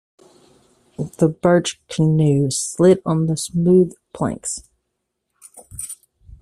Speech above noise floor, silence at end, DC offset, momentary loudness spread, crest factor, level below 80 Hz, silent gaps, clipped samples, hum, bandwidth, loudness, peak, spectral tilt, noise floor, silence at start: 59 dB; 0.45 s; under 0.1%; 16 LU; 18 dB; -52 dBFS; none; under 0.1%; none; 14.5 kHz; -18 LUFS; -2 dBFS; -6 dB/octave; -76 dBFS; 1 s